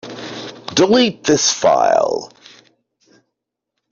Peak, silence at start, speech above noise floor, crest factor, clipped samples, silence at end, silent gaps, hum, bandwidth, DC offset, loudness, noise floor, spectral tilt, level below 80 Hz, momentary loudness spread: -2 dBFS; 0.05 s; 64 dB; 16 dB; under 0.1%; 1.65 s; none; none; 7.6 kHz; under 0.1%; -15 LUFS; -78 dBFS; -3 dB/octave; -58 dBFS; 16 LU